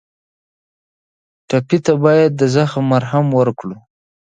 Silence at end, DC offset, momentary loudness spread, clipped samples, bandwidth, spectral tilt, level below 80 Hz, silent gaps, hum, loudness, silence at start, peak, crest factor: 0.55 s; under 0.1%; 8 LU; under 0.1%; 9.2 kHz; -7 dB/octave; -58 dBFS; none; none; -15 LUFS; 1.5 s; 0 dBFS; 16 dB